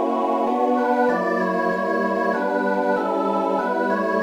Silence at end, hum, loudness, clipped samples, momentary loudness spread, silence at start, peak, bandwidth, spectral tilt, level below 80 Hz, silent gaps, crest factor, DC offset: 0 s; none; -21 LUFS; under 0.1%; 2 LU; 0 s; -8 dBFS; 14.5 kHz; -7 dB/octave; -68 dBFS; none; 14 dB; under 0.1%